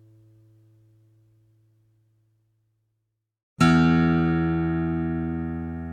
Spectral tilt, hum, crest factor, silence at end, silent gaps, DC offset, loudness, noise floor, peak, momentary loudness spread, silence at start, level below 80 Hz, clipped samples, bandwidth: -7.5 dB/octave; none; 20 dB; 0 s; none; under 0.1%; -23 LUFS; -79 dBFS; -6 dBFS; 11 LU; 3.6 s; -44 dBFS; under 0.1%; 9.8 kHz